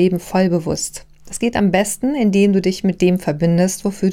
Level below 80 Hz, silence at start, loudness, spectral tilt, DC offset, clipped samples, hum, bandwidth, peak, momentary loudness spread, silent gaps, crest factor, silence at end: -44 dBFS; 0 s; -17 LUFS; -6 dB/octave; under 0.1%; under 0.1%; none; 16 kHz; -2 dBFS; 8 LU; none; 14 dB; 0 s